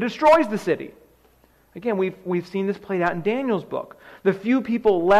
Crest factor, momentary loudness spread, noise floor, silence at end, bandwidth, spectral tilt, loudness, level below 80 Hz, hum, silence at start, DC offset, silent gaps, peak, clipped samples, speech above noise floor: 14 dB; 14 LU; -58 dBFS; 0 s; 14 kHz; -7 dB/octave; -23 LUFS; -56 dBFS; none; 0 s; under 0.1%; none; -8 dBFS; under 0.1%; 36 dB